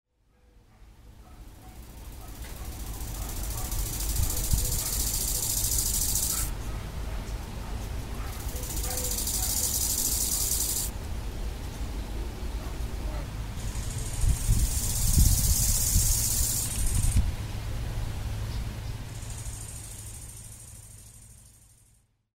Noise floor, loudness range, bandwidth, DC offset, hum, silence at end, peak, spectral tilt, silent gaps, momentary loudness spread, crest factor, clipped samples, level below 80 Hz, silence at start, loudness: -64 dBFS; 13 LU; 16.5 kHz; under 0.1%; none; 0.9 s; -8 dBFS; -3 dB/octave; none; 18 LU; 22 dB; under 0.1%; -32 dBFS; 0.8 s; -29 LUFS